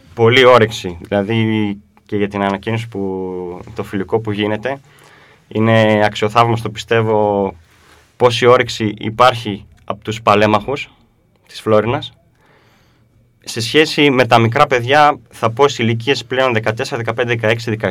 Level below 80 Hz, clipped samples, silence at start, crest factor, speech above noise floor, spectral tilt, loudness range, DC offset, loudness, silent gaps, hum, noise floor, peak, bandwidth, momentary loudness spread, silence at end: -50 dBFS; 0.1%; 0.15 s; 16 dB; 39 dB; -5.5 dB/octave; 7 LU; under 0.1%; -15 LUFS; none; none; -54 dBFS; 0 dBFS; 15.5 kHz; 14 LU; 0 s